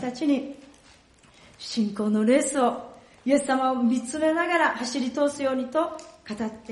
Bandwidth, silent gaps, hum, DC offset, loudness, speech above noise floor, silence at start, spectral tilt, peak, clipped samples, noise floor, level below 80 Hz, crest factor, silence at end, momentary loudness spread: 11.5 kHz; none; none; under 0.1%; -25 LUFS; 31 dB; 0 s; -4 dB/octave; -8 dBFS; under 0.1%; -55 dBFS; -64 dBFS; 18 dB; 0 s; 14 LU